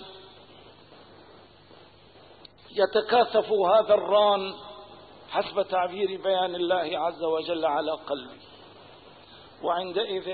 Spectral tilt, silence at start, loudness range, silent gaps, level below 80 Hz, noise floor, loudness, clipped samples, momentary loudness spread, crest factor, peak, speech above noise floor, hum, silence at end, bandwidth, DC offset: -8.5 dB/octave; 0 s; 6 LU; none; -68 dBFS; -53 dBFS; -26 LUFS; under 0.1%; 14 LU; 18 dB; -10 dBFS; 28 dB; none; 0 s; 4.8 kHz; under 0.1%